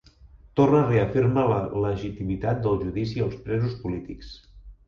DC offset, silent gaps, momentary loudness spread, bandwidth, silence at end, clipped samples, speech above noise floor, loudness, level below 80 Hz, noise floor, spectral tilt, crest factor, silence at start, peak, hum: under 0.1%; none; 12 LU; 7 kHz; 0.15 s; under 0.1%; 27 dB; -25 LUFS; -44 dBFS; -51 dBFS; -9 dB/octave; 18 dB; 0.25 s; -6 dBFS; none